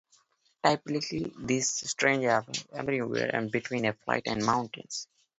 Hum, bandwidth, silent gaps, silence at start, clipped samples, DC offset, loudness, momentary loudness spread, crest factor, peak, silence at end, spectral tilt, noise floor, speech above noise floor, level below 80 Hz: none; 8.2 kHz; none; 0.65 s; under 0.1%; under 0.1%; -29 LUFS; 9 LU; 22 dB; -8 dBFS; 0.35 s; -3.5 dB/octave; -67 dBFS; 38 dB; -64 dBFS